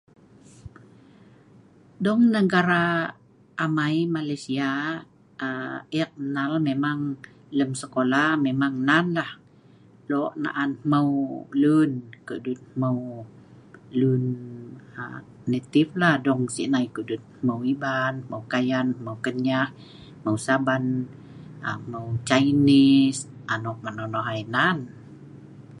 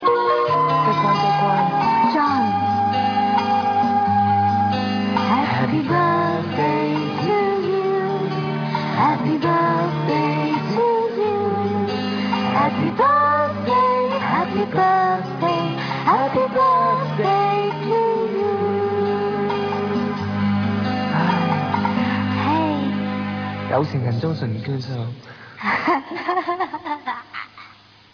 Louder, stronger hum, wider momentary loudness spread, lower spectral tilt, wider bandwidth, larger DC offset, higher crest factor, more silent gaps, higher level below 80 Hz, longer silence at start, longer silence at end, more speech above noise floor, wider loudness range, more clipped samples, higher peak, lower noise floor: second, -24 LUFS vs -20 LUFS; neither; first, 15 LU vs 6 LU; second, -6 dB/octave vs -7.5 dB/octave; first, 11.5 kHz vs 5.4 kHz; neither; first, 22 dB vs 16 dB; neither; about the same, -64 dBFS vs -60 dBFS; first, 0.65 s vs 0 s; second, 0 s vs 0.45 s; first, 29 dB vs 25 dB; about the same, 6 LU vs 5 LU; neither; about the same, -2 dBFS vs -4 dBFS; first, -53 dBFS vs -47 dBFS